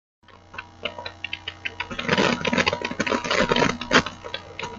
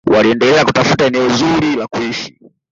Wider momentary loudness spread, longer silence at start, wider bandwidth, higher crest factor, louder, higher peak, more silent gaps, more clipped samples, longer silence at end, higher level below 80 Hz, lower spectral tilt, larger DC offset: first, 13 LU vs 10 LU; first, 0.55 s vs 0.05 s; first, 9.2 kHz vs 7.8 kHz; first, 22 dB vs 12 dB; second, -24 LUFS vs -13 LUFS; about the same, -4 dBFS vs -2 dBFS; neither; neither; second, 0 s vs 0.45 s; second, -50 dBFS vs -44 dBFS; second, -3.5 dB/octave vs -5 dB/octave; neither